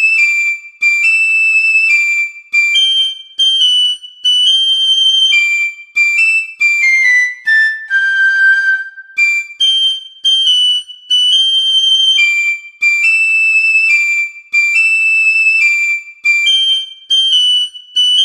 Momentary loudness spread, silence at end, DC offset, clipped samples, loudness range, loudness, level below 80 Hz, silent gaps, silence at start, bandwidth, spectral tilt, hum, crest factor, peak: 6 LU; 0 s; under 0.1%; under 0.1%; 2 LU; -9 LUFS; -68 dBFS; none; 0 s; 16 kHz; 7 dB/octave; none; 10 dB; -2 dBFS